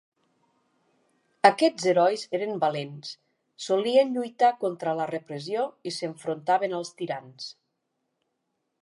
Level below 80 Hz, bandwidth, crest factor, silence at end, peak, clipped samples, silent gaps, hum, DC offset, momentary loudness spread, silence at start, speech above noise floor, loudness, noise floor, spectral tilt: -82 dBFS; 11.5 kHz; 24 dB; 1.3 s; -2 dBFS; under 0.1%; none; none; under 0.1%; 17 LU; 1.45 s; 53 dB; -26 LUFS; -79 dBFS; -4.5 dB/octave